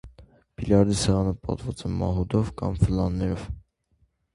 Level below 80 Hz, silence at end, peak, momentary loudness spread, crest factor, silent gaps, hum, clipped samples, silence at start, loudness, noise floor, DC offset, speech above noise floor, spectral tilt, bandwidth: -38 dBFS; 0.75 s; -6 dBFS; 12 LU; 20 dB; none; none; under 0.1%; 0.05 s; -25 LUFS; -67 dBFS; under 0.1%; 43 dB; -6.5 dB/octave; 11.5 kHz